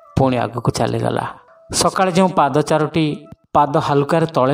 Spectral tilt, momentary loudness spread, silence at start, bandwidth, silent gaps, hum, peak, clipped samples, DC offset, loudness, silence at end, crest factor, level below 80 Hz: -5.5 dB/octave; 7 LU; 0.15 s; 16 kHz; none; none; -2 dBFS; under 0.1%; under 0.1%; -17 LUFS; 0 s; 16 dB; -44 dBFS